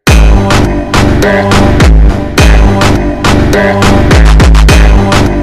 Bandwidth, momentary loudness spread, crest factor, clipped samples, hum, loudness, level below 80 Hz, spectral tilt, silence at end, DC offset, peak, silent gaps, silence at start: 14 kHz; 4 LU; 4 dB; 1%; none; -6 LUFS; -8 dBFS; -5.5 dB/octave; 0 s; 4%; 0 dBFS; none; 0 s